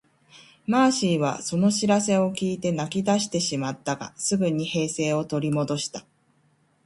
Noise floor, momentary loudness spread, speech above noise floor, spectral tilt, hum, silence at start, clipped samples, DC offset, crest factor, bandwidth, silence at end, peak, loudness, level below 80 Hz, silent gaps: -64 dBFS; 8 LU; 41 dB; -4.5 dB/octave; none; 0.35 s; under 0.1%; under 0.1%; 18 dB; 11.5 kHz; 0.85 s; -6 dBFS; -24 LUFS; -62 dBFS; none